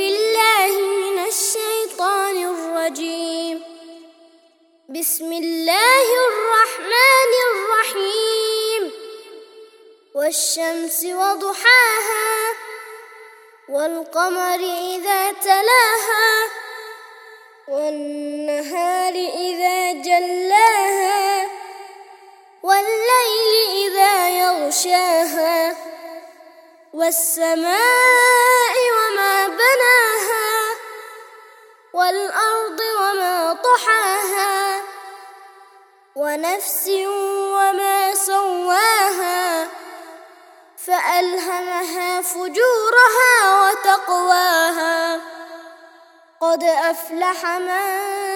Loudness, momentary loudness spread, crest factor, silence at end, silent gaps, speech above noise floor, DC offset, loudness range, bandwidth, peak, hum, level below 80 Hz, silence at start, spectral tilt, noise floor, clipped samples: -17 LUFS; 15 LU; 18 dB; 0 s; none; 38 dB; under 0.1%; 7 LU; over 20 kHz; 0 dBFS; none; -80 dBFS; 0 s; 1.5 dB/octave; -55 dBFS; under 0.1%